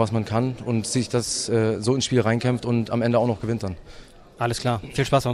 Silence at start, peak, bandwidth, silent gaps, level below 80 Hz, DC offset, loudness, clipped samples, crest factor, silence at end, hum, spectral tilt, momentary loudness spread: 0 s; -6 dBFS; 14 kHz; none; -48 dBFS; under 0.1%; -23 LUFS; under 0.1%; 16 dB; 0 s; none; -5.5 dB/octave; 6 LU